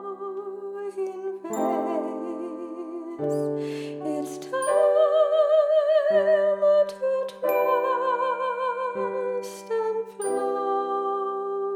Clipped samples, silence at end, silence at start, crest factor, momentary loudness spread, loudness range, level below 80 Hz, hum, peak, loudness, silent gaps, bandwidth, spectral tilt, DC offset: under 0.1%; 0 s; 0 s; 14 dB; 14 LU; 8 LU; -78 dBFS; none; -10 dBFS; -25 LUFS; none; 17 kHz; -5 dB/octave; under 0.1%